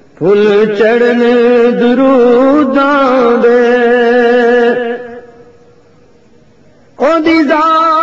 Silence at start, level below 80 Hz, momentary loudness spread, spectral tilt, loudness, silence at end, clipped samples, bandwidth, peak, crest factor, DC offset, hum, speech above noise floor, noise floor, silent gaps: 0.2 s; -48 dBFS; 4 LU; -6.5 dB/octave; -8 LUFS; 0 s; under 0.1%; 7.4 kHz; 0 dBFS; 10 dB; under 0.1%; none; 37 dB; -45 dBFS; none